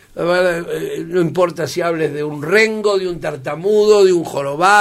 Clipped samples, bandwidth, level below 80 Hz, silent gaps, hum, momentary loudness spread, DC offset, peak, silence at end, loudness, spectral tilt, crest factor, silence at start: under 0.1%; 15 kHz; -52 dBFS; none; none; 11 LU; under 0.1%; 0 dBFS; 0 s; -16 LUFS; -5 dB/octave; 16 dB; 0.15 s